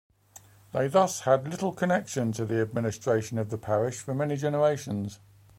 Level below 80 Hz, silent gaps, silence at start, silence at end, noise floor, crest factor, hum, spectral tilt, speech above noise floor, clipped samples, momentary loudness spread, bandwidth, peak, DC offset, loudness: -64 dBFS; none; 0.35 s; 0.45 s; -54 dBFS; 20 dB; none; -6 dB/octave; 27 dB; under 0.1%; 8 LU; 16.5 kHz; -8 dBFS; under 0.1%; -28 LUFS